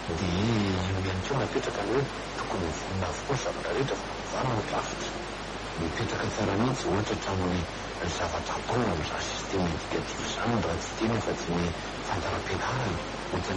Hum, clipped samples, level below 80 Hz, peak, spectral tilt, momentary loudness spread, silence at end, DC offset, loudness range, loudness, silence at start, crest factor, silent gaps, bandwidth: none; under 0.1%; -46 dBFS; -14 dBFS; -5 dB/octave; 6 LU; 0 s; under 0.1%; 2 LU; -30 LUFS; 0 s; 16 dB; none; 10.5 kHz